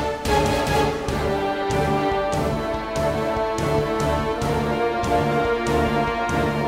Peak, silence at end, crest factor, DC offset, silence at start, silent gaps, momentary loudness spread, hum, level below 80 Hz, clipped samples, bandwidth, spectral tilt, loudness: -8 dBFS; 0 s; 14 dB; under 0.1%; 0 s; none; 3 LU; none; -34 dBFS; under 0.1%; 16 kHz; -5.5 dB/octave; -22 LUFS